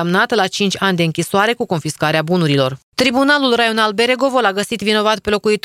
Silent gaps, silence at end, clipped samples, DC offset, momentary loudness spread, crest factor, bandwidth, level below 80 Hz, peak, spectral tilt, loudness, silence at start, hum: 2.83-2.92 s; 0.05 s; under 0.1%; under 0.1%; 4 LU; 14 dB; 16 kHz; -52 dBFS; 0 dBFS; -4.5 dB/octave; -15 LUFS; 0 s; none